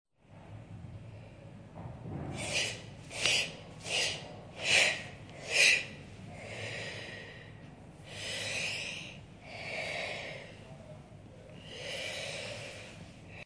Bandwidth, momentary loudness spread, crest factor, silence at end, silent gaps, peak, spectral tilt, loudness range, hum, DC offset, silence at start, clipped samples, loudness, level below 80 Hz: 11 kHz; 25 LU; 26 dB; 0 s; none; -12 dBFS; -1.5 dB/octave; 12 LU; none; under 0.1%; 0.3 s; under 0.1%; -32 LUFS; -62 dBFS